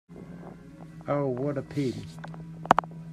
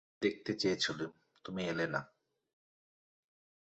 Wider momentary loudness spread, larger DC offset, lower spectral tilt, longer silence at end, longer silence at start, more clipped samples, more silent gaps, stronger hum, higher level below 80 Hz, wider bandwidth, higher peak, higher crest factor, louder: first, 21 LU vs 12 LU; neither; first, -7 dB/octave vs -3 dB/octave; second, 0 s vs 1.65 s; about the same, 0.1 s vs 0.2 s; neither; neither; neither; first, -58 dBFS vs -74 dBFS; first, 13 kHz vs 8 kHz; first, 0 dBFS vs -18 dBFS; first, 30 dB vs 22 dB; first, -28 LUFS vs -37 LUFS